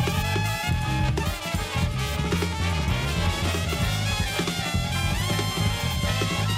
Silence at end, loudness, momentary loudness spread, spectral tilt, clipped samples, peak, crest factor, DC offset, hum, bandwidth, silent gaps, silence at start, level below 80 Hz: 0 s; -25 LUFS; 2 LU; -4.5 dB/octave; under 0.1%; -12 dBFS; 12 dB; under 0.1%; none; 16 kHz; none; 0 s; -34 dBFS